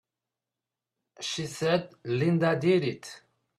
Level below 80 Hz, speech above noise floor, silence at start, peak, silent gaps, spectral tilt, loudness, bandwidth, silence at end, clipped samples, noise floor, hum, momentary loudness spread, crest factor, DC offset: -68 dBFS; 62 dB; 1.2 s; -12 dBFS; none; -5.5 dB/octave; -28 LUFS; 13 kHz; 0.4 s; under 0.1%; -89 dBFS; none; 12 LU; 18 dB; under 0.1%